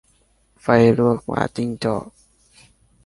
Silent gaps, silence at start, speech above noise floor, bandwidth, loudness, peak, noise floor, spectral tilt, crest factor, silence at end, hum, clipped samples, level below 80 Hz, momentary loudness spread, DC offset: none; 0.65 s; 42 dB; 11.5 kHz; -19 LUFS; -2 dBFS; -60 dBFS; -7.5 dB/octave; 20 dB; 0.95 s; none; under 0.1%; -50 dBFS; 11 LU; under 0.1%